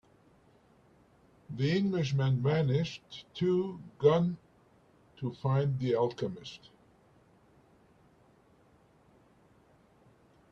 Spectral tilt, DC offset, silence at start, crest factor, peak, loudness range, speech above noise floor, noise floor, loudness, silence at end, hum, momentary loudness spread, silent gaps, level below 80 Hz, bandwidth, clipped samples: -8 dB/octave; under 0.1%; 1.5 s; 22 dB; -12 dBFS; 8 LU; 34 dB; -64 dBFS; -31 LUFS; 3.95 s; none; 18 LU; none; -68 dBFS; 7.2 kHz; under 0.1%